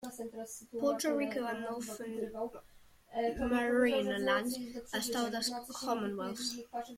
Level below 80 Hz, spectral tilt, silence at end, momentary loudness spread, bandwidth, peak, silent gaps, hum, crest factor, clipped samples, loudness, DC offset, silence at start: -62 dBFS; -3.5 dB/octave; 0 s; 12 LU; 16.5 kHz; -18 dBFS; none; none; 18 dB; under 0.1%; -35 LUFS; under 0.1%; 0 s